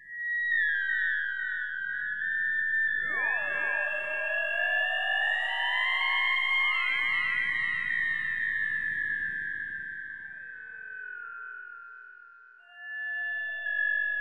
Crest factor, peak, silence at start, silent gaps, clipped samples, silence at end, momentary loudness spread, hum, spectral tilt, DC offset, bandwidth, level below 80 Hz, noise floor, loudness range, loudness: 14 dB; -16 dBFS; 0 s; none; under 0.1%; 0 s; 15 LU; none; -1.5 dB/octave; 0.4%; 10.5 kHz; -68 dBFS; -53 dBFS; 12 LU; -28 LUFS